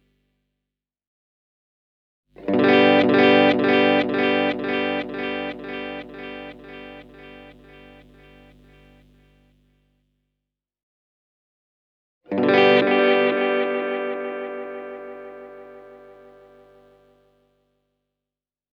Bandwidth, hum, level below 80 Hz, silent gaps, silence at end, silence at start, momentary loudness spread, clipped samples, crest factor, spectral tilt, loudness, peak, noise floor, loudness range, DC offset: 6.6 kHz; 50 Hz at -50 dBFS; -60 dBFS; 10.83-12.21 s; 2.85 s; 2.4 s; 24 LU; under 0.1%; 20 dB; -7 dB/octave; -19 LUFS; -4 dBFS; -89 dBFS; 20 LU; under 0.1%